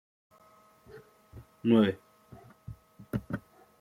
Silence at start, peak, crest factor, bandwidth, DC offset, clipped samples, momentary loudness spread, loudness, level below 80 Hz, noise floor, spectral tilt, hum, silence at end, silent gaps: 0.95 s; -12 dBFS; 22 dB; 13 kHz; under 0.1%; under 0.1%; 29 LU; -30 LUFS; -60 dBFS; -61 dBFS; -8 dB/octave; none; 0.4 s; none